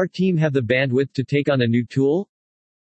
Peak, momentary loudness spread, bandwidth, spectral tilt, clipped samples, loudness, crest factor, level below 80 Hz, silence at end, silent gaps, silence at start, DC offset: -6 dBFS; 3 LU; 8.4 kHz; -8 dB/octave; under 0.1%; -20 LUFS; 14 dB; -64 dBFS; 0.6 s; none; 0 s; under 0.1%